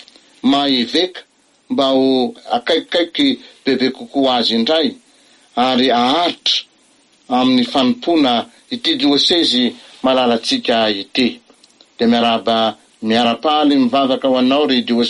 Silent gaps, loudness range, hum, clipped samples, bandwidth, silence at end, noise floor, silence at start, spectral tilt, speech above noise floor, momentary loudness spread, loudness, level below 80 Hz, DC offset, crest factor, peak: none; 2 LU; none; under 0.1%; 11.5 kHz; 0 s; -53 dBFS; 0.45 s; -4 dB/octave; 38 dB; 7 LU; -15 LUFS; -58 dBFS; under 0.1%; 12 dB; -4 dBFS